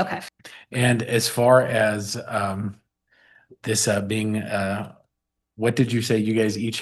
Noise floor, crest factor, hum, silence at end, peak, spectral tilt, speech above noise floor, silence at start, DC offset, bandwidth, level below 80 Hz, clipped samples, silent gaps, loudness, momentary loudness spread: -81 dBFS; 18 dB; none; 0 s; -4 dBFS; -4.5 dB/octave; 59 dB; 0 s; under 0.1%; 12.5 kHz; -62 dBFS; under 0.1%; none; -22 LUFS; 14 LU